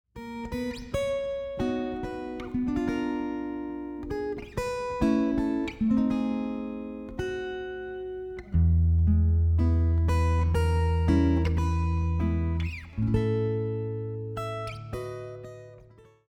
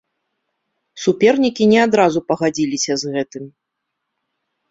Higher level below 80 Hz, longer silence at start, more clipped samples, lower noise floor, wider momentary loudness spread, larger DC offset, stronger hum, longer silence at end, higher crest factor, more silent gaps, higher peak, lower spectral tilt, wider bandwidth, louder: first, -34 dBFS vs -60 dBFS; second, 0.15 s vs 0.95 s; neither; second, -54 dBFS vs -77 dBFS; about the same, 13 LU vs 11 LU; neither; neither; second, 0.4 s vs 1.2 s; about the same, 16 dB vs 18 dB; neither; second, -12 dBFS vs -2 dBFS; first, -8 dB/octave vs -4.5 dB/octave; first, 9.4 kHz vs 7.8 kHz; second, -28 LUFS vs -16 LUFS